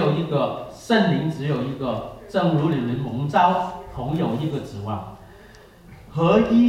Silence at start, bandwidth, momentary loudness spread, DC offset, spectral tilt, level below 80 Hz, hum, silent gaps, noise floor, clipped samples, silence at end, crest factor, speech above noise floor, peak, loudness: 0 s; 12.5 kHz; 12 LU; under 0.1%; -7.5 dB/octave; -50 dBFS; none; none; -47 dBFS; under 0.1%; 0 s; 18 dB; 26 dB; -4 dBFS; -23 LUFS